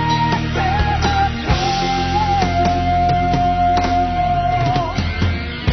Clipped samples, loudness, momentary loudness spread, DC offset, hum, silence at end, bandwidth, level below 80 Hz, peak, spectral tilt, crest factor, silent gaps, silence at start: under 0.1%; -17 LUFS; 3 LU; under 0.1%; none; 0 s; 6.4 kHz; -26 dBFS; -4 dBFS; -6 dB/octave; 12 dB; none; 0 s